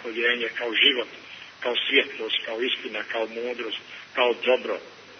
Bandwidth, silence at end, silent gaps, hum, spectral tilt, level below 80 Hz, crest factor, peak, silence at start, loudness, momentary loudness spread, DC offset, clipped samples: 6.4 kHz; 0 s; none; none; -2.5 dB/octave; -80 dBFS; 22 dB; -4 dBFS; 0 s; -24 LUFS; 14 LU; under 0.1%; under 0.1%